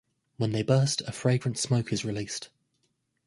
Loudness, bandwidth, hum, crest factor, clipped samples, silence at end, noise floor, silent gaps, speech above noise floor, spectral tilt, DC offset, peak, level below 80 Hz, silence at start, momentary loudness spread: -28 LUFS; 11.5 kHz; none; 20 dB; under 0.1%; 0.8 s; -75 dBFS; none; 48 dB; -5 dB/octave; under 0.1%; -10 dBFS; -60 dBFS; 0.4 s; 11 LU